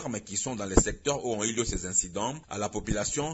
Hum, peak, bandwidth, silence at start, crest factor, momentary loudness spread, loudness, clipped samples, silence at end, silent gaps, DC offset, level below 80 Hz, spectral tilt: none; -6 dBFS; 8.2 kHz; 0 s; 24 dB; 8 LU; -29 LUFS; under 0.1%; 0 s; none; under 0.1%; -40 dBFS; -3.5 dB/octave